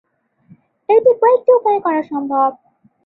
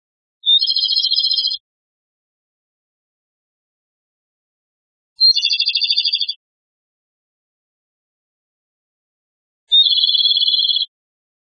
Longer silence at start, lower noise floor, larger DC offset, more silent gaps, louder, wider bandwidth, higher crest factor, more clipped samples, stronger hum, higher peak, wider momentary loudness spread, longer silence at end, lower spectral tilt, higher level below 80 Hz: first, 0.9 s vs 0.45 s; second, -50 dBFS vs under -90 dBFS; neither; second, none vs 1.60-5.16 s, 6.36-9.67 s; about the same, -15 LUFS vs -13 LUFS; second, 4 kHz vs 6.6 kHz; about the same, 14 dB vs 18 dB; neither; neither; about the same, -2 dBFS vs -2 dBFS; about the same, 8 LU vs 10 LU; second, 0.5 s vs 0.65 s; first, -9 dB/octave vs 9.5 dB/octave; first, -68 dBFS vs -80 dBFS